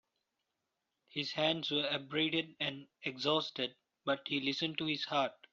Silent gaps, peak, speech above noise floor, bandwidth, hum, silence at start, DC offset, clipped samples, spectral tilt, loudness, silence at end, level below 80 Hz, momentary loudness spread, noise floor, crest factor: none; -18 dBFS; 51 dB; 7.6 kHz; none; 1.15 s; under 0.1%; under 0.1%; -2 dB/octave; -35 LUFS; 0.2 s; -78 dBFS; 7 LU; -87 dBFS; 20 dB